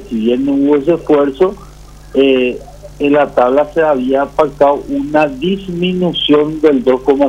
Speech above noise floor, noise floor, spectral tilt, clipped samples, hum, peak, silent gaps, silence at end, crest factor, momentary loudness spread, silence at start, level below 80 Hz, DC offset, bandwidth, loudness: 23 dB; -35 dBFS; -7 dB/octave; under 0.1%; none; 0 dBFS; none; 0 s; 12 dB; 6 LU; 0 s; -38 dBFS; under 0.1%; 10.5 kHz; -13 LUFS